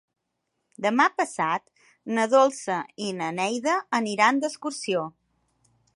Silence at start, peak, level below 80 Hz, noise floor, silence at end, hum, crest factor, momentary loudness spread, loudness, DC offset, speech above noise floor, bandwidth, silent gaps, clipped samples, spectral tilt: 0.8 s; -4 dBFS; -78 dBFS; -79 dBFS; 0.85 s; none; 22 dB; 10 LU; -25 LUFS; under 0.1%; 54 dB; 11.5 kHz; none; under 0.1%; -3.5 dB/octave